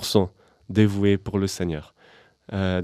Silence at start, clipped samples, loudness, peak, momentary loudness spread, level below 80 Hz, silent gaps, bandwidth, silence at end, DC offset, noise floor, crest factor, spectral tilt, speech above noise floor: 0 s; under 0.1%; -24 LUFS; -2 dBFS; 11 LU; -50 dBFS; none; 14.5 kHz; 0 s; under 0.1%; -55 dBFS; 22 dB; -6 dB/octave; 33 dB